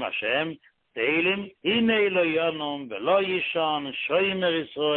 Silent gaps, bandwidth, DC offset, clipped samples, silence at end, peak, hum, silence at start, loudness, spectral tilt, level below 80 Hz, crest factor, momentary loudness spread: none; 4.4 kHz; under 0.1%; under 0.1%; 0 s; -10 dBFS; none; 0 s; -25 LUFS; -9 dB/octave; -66 dBFS; 14 dB; 9 LU